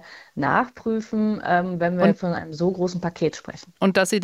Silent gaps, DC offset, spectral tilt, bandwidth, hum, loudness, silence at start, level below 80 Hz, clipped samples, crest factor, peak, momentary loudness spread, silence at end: none; under 0.1%; -6 dB/octave; 15 kHz; none; -23 LUFS; 0.05 s; -58 dBFS; under 0.1%; 18 dB; -4 dBFS; 7 LU; 0 s